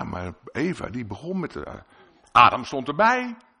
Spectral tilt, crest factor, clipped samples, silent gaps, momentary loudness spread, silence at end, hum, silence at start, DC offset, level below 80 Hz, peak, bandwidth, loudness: -5.5 dB/octave; 24 dB; under 0.1%; none; 18 LU; 0.25 s; none; 0 s; under 0.1%; -52 dBFS; 0 dBFS; 10.5 kHz; -22 LUFS